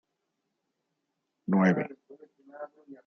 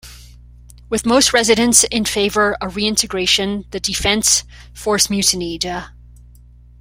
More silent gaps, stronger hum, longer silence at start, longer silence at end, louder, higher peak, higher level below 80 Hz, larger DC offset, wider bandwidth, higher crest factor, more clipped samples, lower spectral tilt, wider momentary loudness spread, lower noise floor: neither; second, none vs 60 Hz at -40 dBFS; first, 1.5 s vs 0.05 s; second, 0.1 s vs 0.9 s; second, -27 LUFS vs -15 LUFS; second, -10 dBFS vs 0 dBFS; second, -76 dBFS vs -40 dBFS; neither; second, 6.4 kHz vs 16.5 kHz; about the same, 22 dB vs 18 dB; neither; first, -8 dB/octave vs -2 dB/octave; first, 21 LU vs 11 LU; first, -82 dBFS vs -43 dBFS